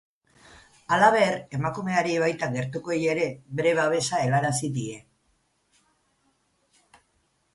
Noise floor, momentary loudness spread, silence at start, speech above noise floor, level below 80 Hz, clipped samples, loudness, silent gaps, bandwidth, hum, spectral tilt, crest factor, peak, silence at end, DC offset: -70 dBFS; 11 LU; 0.9 s; 46 dB; -62 dBFS; under 0.1%; -25 LUFS; none; 11.5 kHz; none; -5 dB/octave; 22 dB; -6 dBFS; 2.55 s; under 0.1%